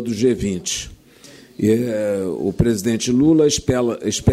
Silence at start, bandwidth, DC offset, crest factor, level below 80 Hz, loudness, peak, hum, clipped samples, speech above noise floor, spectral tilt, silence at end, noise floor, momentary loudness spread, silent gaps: 0 s; 15.5 kHz; under 0.1%; 14 dB; -40 dBFS; -19 LUFS; -4 dBFS; none; under 0.1%; 27 dB; -5.5 dB/octave; 0 s; -45 dBFS; 9 LU; none